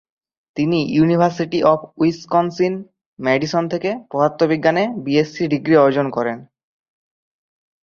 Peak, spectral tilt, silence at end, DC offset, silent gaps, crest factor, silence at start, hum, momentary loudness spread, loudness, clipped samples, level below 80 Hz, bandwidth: -2 dBFS; -7 dB/octave; 1.4 s; under 0.1%; 3.06-3.13 s; 18 dB; 0.55 s; none; 8 LU; -18 LUFS; under 0.1%; -58 dBFS; 7 kHz